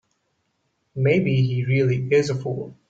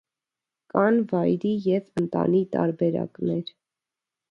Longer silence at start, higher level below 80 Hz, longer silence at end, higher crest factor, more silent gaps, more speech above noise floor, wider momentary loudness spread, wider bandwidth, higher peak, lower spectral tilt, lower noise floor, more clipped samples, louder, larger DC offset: first, 0.95 s vs 0.75 s; first, -58 dBFS vs -66 dBFS; second, 0.15 s vs 0.85 s; about the same, 16 dB vs 20 dB; neither; second, 51 dB vs 65 dB; about the same, 9 LU vs 7 LU; about the same, 7.8 kHz vs 7.2 kHz; about the same, -6 dBFS vs -6 dBFS; second, -7.5 dB/octave vs -9 dB/octave; second, -72 dBFS vs -89 dBFS; neither; first, -21 LUFS vs -24 LUFS; neither